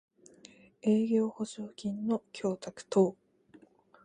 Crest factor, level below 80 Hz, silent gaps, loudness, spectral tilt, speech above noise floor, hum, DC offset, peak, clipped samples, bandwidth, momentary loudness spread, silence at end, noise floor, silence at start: 20 dB; -76 dBFS; none; -32 LUFS; -7 dB/octave; 30 dB; none; under 0.1%; -12 dBFS; under 0.1%; 9.8 kHz; 11 LU; 0.9 s; -61 dBFS; 0.85 s